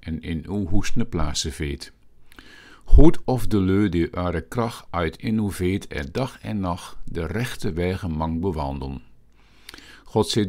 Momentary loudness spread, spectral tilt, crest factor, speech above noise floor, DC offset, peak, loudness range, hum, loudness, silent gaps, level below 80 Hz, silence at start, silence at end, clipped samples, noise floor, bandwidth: 13 LU; -6 dB/octave; 20 dB; 31 dB; under 0.1%; 0 dBFS; 6 LU; none; -25 LUFS; none; -28 dBFS; 0.05 s; 0 s; under 0.1%; -51 dBFS; 13 kHz